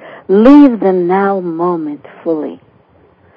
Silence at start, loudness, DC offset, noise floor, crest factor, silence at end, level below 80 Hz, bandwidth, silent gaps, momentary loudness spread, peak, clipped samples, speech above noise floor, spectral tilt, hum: 0 s; -11 LUFS; under 0.1%; -48 dBFS; 12 dB; 0.8 s; -48 dBFS; 5.4 kHz; none; 16 LU; 0 dBFS; 2%; 38 dB; -9.5 dB/octave; none